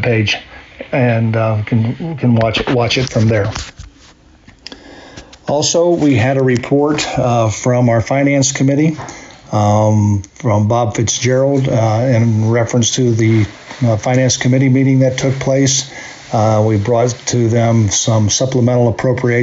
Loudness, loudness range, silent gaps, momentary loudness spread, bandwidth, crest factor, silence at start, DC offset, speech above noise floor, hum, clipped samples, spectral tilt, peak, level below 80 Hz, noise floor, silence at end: -13 LUFS; 4 LU; none; 7 LU; 8 kHz; 10 dB; 0 s; under 0.1%; 31 dB; none; under 0.1%; -5.5 dB/octave; -4 dBFS; -42 dBFS; -44 dBFS; 0 s